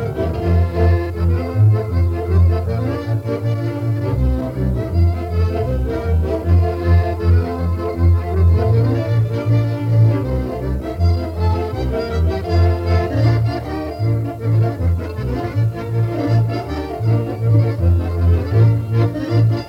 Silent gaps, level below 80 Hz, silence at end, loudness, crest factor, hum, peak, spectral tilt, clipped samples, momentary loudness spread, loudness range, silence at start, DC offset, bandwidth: none; -26 dBFS; 0 s; -18 LUFS; 12 dB; none; -4 dBFS; -9 dB/octave; under 0.1%; 6 LU; 3 LU; 0 s; under 0.1%; 5.8 kHz